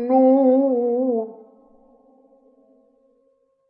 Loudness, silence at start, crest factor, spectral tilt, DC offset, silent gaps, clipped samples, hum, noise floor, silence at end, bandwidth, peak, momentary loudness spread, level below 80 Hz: -18 LUFS; 0 s; 14 dB; -11.5 dB/octave; under 0.1%; none; under 0.1%; none; -64 dBFS; 2.35 s; 2.8 kHz; -6 dBFS; 11 LU; -76 dBFS